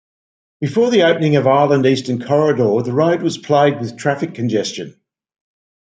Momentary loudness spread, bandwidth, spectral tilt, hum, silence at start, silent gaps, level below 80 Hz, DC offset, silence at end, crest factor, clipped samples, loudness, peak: 8 LU; 9.4 kHz; -6 dB/octave; none; 0.6 s; none; -62 dBFS; under 0.1%; 0.9 s; 14 dB; under 0.1%; -16 LUFS; -2 dBFS